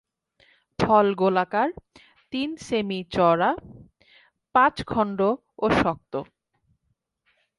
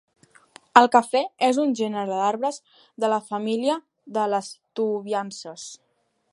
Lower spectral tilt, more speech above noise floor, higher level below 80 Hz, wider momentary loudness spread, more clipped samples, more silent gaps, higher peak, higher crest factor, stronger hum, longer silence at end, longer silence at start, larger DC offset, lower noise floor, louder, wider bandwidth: first, -6.5 dB/octave vs -4 dB/octave; first, 52 dB vs 30 dB; first, -52 dBFS vs -80 dBFS; second, 13 LU vs 17 LU; neither; neither; second, -6 dBFS vs 0 dBFS; about the same, 20 dB vs 24 dB; neither; first, 1.35 s vs 0.6 s; about the same, 0.8 s vs 0.75 s; neither; first, -75 dBFS vs -53 dBFS; about the same, -23 LUFS vs -23 LUFS; about the same, 11.5 kHz vs 11.5 kHz